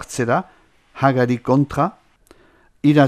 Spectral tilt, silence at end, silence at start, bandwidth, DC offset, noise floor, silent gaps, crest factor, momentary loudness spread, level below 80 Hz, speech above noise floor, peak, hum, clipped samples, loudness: -7 dB/octave; 0 s; 0 s; 14 kHz; under 0.1%; -54 dBFS; none; 18 dB; 6 LU; -50 dBFS; 36 dB; 0 dBFS; none; under 0.1%; -19 LUFS